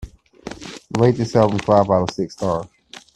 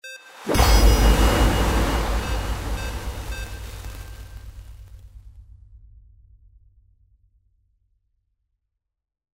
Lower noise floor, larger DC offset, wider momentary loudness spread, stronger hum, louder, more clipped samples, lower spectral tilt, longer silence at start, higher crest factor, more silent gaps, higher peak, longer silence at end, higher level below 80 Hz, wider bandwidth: second, -37 dBFS vs -79 dBFS; neither; second, 20 LU vs 24 LU; neither; first, -18 LUFS vs -22 LUFS; neither; first, -7 dB/octave vs -4.5 dB/octave; about the same, 0 s vs 0.05 s; about the same, 20 dB vs 20 dB; neither; about the same, 0 dBFS vs -2 dBFS; second, 0.5 s vs 3.9 s; second, -46 dBFS vs -26 dBFS; second, 10.5 kHz vs 16.5 kHz